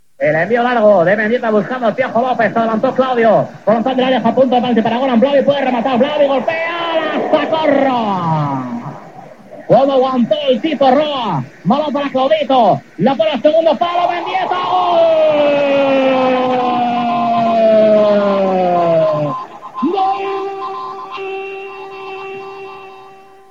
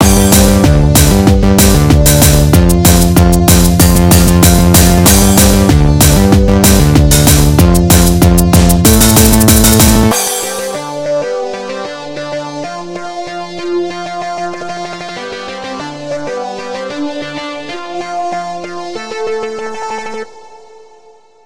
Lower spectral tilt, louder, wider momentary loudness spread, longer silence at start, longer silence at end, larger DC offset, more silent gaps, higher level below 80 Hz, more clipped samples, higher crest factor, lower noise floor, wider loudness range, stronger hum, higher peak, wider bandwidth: first, -7 dB/octave vs -4.5 dB/octave; second, -14 LUFS vs -8 LUFS; about the same, 14 LU vs 16 LU; first, 0.2 s vs 0 s; second, 0.4 s vs 1.05 s; second, 0.4% vs 1%; neither; second, -68 dBFS vs -16 dBFS; second, under 0.1% vs 2%; about the same, 14 dB vs 10 dB; about the same, -40 dBFS vs -43 dBFS; second, 4 LU vs 14 LU; neither; about the same, 0 dBFS vs 0 dBFS; second, 7.4 kHz vs over 20 kHz